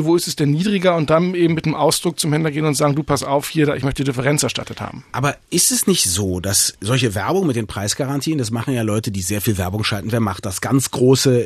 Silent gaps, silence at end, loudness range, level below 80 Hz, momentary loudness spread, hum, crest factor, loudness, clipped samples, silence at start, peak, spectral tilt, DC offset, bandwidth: none; 0 s; 3 LU; -48 dBFS; 7 LU; none; 16 dB; -18 LUFS; under 0.1%; 0 s; -2 dBFS; -4.5 dB/octave; under 0.1%; 14 kHz